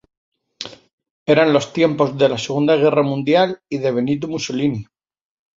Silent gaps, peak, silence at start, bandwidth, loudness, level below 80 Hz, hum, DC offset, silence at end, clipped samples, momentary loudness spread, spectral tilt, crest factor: 0.93-0.98 s, 1.10-1.26 s; -2 dBFS; 0.6 s; 7.8 kHz; -17 LUFS; -58 dBFS; none; under 0.1%; 0.75 s; under 0.1%; 15 LU; -6 dB/octave; 18 dB